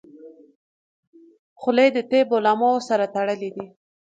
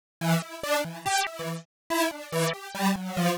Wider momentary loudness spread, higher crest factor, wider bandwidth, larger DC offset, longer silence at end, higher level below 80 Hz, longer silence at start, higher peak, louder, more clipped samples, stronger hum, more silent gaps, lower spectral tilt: first, 14 LU vs 5 LU; about the same, 18 dB vs 16 dB; second, 8.8 kHz vs over 20 kHz; neither; first, 0.45 s vs 0 s; second, -74 dBFS vs -64 dBFS; about the same, 0.25 s vs 0.2 s; first, -4 dBFS vs -12 dBFS; first, -21 LUFS vs -28 LUFS; neither; neither; first, 0.55-1.13 s, 1.39-1.56 s vs 1.65-1.90 s; about the same, -5 dB/octave vs -4 dB/octave